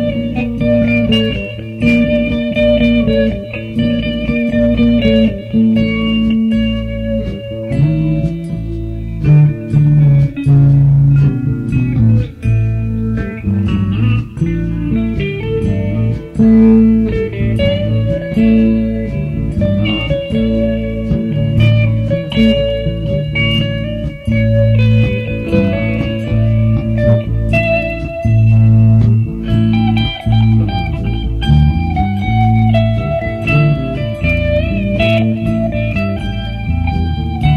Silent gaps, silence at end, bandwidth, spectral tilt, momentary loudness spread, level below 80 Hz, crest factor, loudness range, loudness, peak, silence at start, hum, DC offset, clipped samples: none; 0 s; 5.2 kHz; -9 dB/octave; 9 LU; -24 dBFS; 12 dB; 4 LU; -13 LUFS; 0 dBFS; 0 s; none; under 0.1%; under 0.1%